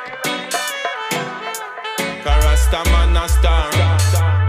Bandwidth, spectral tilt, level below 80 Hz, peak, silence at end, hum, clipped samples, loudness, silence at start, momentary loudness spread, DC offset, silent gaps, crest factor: 16 kHz; -4.5 dB/octave; -18 dBFS; -4 dBFS; 0 s; none; under 0.1%; -18 LUFS; 0 s; 10 LU; under 0.1%; none; 12 dB